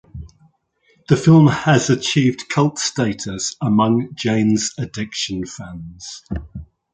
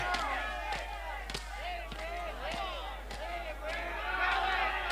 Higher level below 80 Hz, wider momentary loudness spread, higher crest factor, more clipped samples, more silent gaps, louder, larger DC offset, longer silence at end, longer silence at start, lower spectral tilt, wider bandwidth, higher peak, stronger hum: about the same, -42 dBFS vs -44 dBFS; first, 20 LU vs 10 LU; about the same, 18 dB vs 16 dB; neither; neither; first, -17 LUFS vs -36 LUFS; neither; first, 0.3 s vs 0 s; first, 0.15 s vs 0 s; first, -5.5 dB/octave vs -3 dB/octave; second, 9.4 kHz vs 16 kHz; first, -2 dBFS vs -20 dBFS; neither